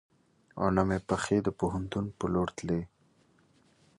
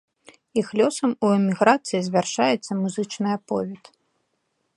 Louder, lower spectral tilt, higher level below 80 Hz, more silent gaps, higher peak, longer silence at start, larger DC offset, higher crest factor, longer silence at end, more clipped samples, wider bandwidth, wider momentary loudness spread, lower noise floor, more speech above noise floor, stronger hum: second, -31 LUFS vs -22 LUFS; first, -6.5 dB/octave vs -5 dB/octave; first, -52 dBFS vs -70 dBFS; neither; second, -10 dBFS vs -2 dBFS; about the same, 0.55 s vs 0.55 s; neither; about the same, 22 dB vs 22 dB; about the same, 1.1 s vs 1 s; neither; about the same, 11.5 kHz vs 11.5 kHz; about the same, 7 LU vs 9 LU; second, -66 dBFS vs -73 dBFS; second, 36 dB vs 51 dB; neither